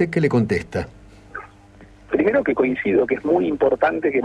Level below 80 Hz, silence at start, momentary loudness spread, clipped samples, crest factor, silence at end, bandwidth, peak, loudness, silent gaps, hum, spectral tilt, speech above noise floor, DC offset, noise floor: -48 dBFS; 0 s; 18 LU; under 0.1%; 16 dB; 0 s; 10 kHz; -4 dBFS; -20 LUFS; none; none; -8 dB/octave; 27 dB; under 0.1%; -46 dBFS